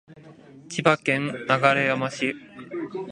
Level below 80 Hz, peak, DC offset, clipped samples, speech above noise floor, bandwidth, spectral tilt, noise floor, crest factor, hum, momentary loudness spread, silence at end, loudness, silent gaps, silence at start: -68 dBFS; -2 dBFS; under 0.1%; under 0.1%; 24 dB; 11 kHz; -5 dB/octave; -47 dBFS; 24 dB; none; 14 LU; 0 s; -23 LUFS; none; 0.1 s